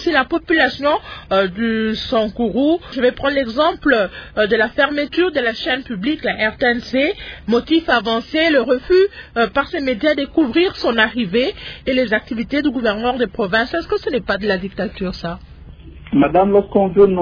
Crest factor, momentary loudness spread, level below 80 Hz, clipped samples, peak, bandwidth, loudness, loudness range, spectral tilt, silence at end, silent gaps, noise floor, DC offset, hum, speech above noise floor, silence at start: 18 dB; 6 LU; -42 dBFS; under 0.1%; 0 dBFS; 5.4 kHz; -17 LUFS; 3 LU; -6.5 dB/octave; 0 s; none; -37 dBFS; under 0.1%; none; 20 dB; 0 s